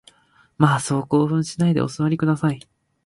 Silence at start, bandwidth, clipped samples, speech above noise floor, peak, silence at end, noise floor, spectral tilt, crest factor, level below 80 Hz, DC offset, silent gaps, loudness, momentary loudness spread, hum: 0.6 s; 11.5 kHz; under 0.1%; 34 dB; -2 dBFS; 0.45 s; -54 dBFS; -6.5 dB/octave; 18 dB; -56 dBFS; under 0.1%; none; -21 LUFS; 4 LU; none